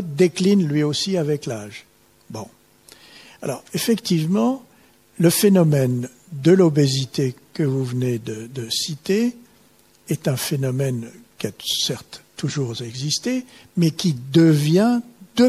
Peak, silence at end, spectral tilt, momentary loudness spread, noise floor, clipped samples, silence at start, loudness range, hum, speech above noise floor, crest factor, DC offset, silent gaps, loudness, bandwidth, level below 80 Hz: -4 dBFS; 0 s; -5.5 dB/octave; 16 LU; -55 dBFS; under 0.1%; 0 s; 7 LU; none; 35 dB; 16 dB; under 0.1%; none; -20 LUFS; 16 kHz; -62 dBFS